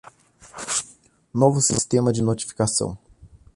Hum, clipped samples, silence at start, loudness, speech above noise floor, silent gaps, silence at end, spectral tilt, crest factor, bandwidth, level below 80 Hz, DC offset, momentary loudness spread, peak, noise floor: none; under 0.1%; 0.45 s; -22 LUFS; 32 dB; none; 0.3 s; -4.5 dB/octave; 20 dB; 11.5 kHz; -50 dBFS; under 0.1%; 20 LU; -4 dBFS; -53 dBFS